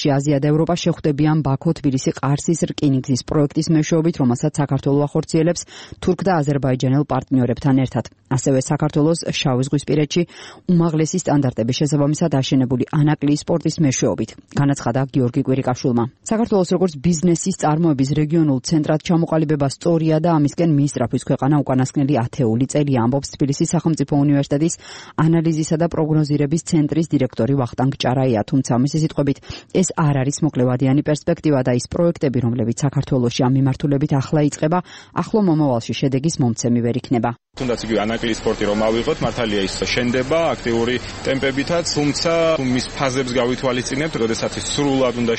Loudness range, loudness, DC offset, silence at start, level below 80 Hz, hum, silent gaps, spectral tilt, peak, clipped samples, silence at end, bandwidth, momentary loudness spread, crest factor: 2 LU; -19 LUFS; 0.1%; 0 s; -44 dBFS; none; none; -6 dB/octave; -2 dBFS; under 0.1%; 0 s; 8.8 kHz; 4 LU; 16 dB